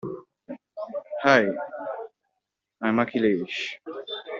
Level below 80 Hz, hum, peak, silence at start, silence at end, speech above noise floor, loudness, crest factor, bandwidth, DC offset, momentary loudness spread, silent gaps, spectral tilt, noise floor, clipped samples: -70 dBFS; none; -2 dBFS; 0.05 s; 0 s; 59 dB; -25 LUFS; 24 dB; 7.6 kHz; under 0.1%; 21 LU; none; -3 dB/octave; -82 dBFS; under 0.1%